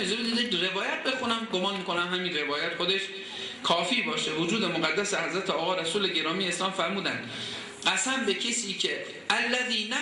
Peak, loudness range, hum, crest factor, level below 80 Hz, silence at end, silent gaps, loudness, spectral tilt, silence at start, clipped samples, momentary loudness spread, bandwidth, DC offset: -10 dBFS; 1 LU; none; 20 dB; -70 dBFS; 0 s; none; -27 LUFS; -2.5 dB/octave; 0 s; under 0.1%; 5 LU; 11.5 kHz; under 0.1%